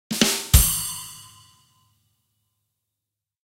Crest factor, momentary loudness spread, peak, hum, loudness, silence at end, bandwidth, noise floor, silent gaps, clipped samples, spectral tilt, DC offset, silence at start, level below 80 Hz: 24 dB; 21 LU; 0 dBFS; none; -19 LUFS; 2.2 s; 16 kHz; -85 dBFS; none; under 0.1%; -3 dB/octave; under 0.1%; 0.1 s; -30 dBFS